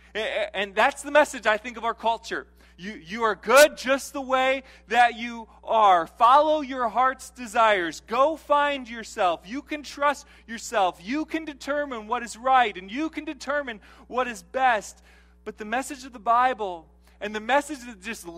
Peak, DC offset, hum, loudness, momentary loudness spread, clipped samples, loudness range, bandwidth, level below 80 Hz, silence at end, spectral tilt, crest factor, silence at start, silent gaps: -2 dBFS; under 0.1%; none; -24 LUFS; 16 LU; under 0.1%; 6 LU; 16 kHz; -56 dBFS; 0 s; -2.5 dB/octave; 22 dB; 0.15 s; none